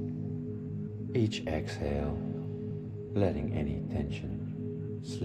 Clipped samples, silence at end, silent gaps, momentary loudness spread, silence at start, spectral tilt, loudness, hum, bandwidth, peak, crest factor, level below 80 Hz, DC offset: under 0.1%; 0 s; none; 8 LU; 0 s; -7.5 dB/octave; -35 LUFS; none; 9.4 kHz; -14 dBFS; 20 dB; -46 dBFS; under 0.1%